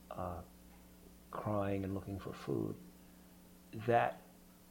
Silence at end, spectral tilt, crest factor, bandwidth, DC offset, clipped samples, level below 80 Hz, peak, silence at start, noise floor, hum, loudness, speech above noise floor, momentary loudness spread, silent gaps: 0 s; -7 dB/octave; 22 dB; 17 kHz; under 0.1%; under 0.1%; -64 dBFS; -18 dBFS; 0 s; -60 dBFS; none; -39 LUFS; 23 dB; 26 LU; none